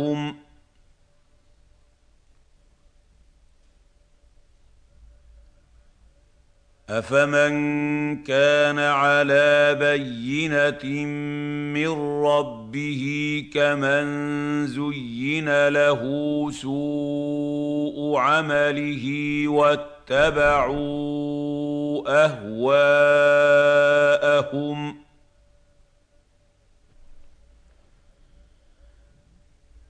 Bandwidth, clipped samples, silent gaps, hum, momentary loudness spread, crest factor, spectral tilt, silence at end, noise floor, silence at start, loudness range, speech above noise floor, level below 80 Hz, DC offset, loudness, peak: 9.4 kHz; under 0.1%; none; none; 11 LU; 18 dB; -5.5 dB/octave; 2.65 s; -60 dBFS; 0 s; 7 LU; 39 dB; -52 dBFS; under 0.1%; -21 LUFS; -6 dBFS